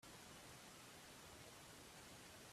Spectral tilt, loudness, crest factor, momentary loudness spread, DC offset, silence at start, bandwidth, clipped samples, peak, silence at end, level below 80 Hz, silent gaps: -2.5 dB/octave; -59 LUFS; 14 dB; 0 LU; under 0.1%; 0 s; 15.5 kHz; under 0.1%; -48 dBFS; 0 s; -78 dBFS; none